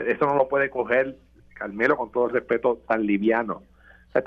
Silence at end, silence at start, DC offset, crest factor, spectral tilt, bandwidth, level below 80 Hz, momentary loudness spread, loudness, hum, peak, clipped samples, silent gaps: 0 s; 0 s; under 0.1%; 18 dB; -8 dB/octave; 6.2 kHz; -58 dBFS; 10 LU; -23 LUFS; none; -6 dBFS; under 0.1%; none